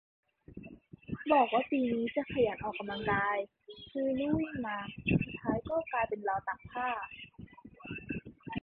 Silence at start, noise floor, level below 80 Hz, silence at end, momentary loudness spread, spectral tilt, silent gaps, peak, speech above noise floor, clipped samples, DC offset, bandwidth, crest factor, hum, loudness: 0.5 s; -52 dBFS; -58 dBFS; 0.05 s; 21 LU; -10 dB/octave; none; -14 dBFS; 20 dB; under 0.1%; under 0.1%; 4.5 kHz; 20 dB; none; -33 LUFS